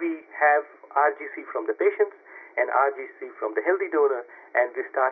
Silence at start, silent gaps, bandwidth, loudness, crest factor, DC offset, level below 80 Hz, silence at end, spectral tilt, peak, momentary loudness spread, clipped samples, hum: 0 s; none; 3.6 kHz; -25 LUFS; 16 dB; under 0.1%; under -90 dBFS; 0 s; -6.5 dB/octave; -8 dBFS; 11 LU; under 0.1%; none